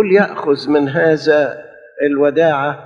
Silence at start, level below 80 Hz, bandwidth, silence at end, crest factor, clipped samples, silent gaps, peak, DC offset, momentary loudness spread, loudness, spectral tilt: 0 s; -60 dBFS; 7.4 kHz; 0 s; 14 dB; under 0.1%; none; 0 dBFS; under 0.1%; 7 LU; -14 LUFS; -7 dB/octave